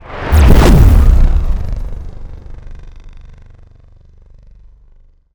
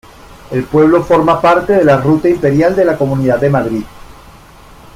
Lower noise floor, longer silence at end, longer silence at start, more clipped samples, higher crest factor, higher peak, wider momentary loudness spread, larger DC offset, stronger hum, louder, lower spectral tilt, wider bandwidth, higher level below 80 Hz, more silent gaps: first, -44 dBFS vs -38 dBFS; first, 2.25 s vs 0.85 s; second, 0.1 s vs 0.3 s; neither; about the same, 12 dB vs 12 dB; about the same, 0 dBFS vs 0 dBFS; first, 26 LU vs 8 LU; neither; first, 50 Hz at -45 dBFS vs none; about the same, -11 LUFS vs -11 LUFS; about the same, -7 dB/octave vs -8 dB/octave; first, over 20 kHz vs 15.5 kHz; first, -14 dBFS vs -40 dBFS; neither